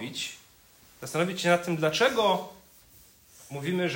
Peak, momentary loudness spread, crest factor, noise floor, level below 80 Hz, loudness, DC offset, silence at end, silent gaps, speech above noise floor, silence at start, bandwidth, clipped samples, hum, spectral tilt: -10 dBFS; 19 LU; 20 dB; -57 dBFS; -66 dBFS; -27 LUFS; under 0.1%; 0 s; none; 30 dB; 0 s; 16.5 kHz; under 0.1%; none; -4.5 dB/octave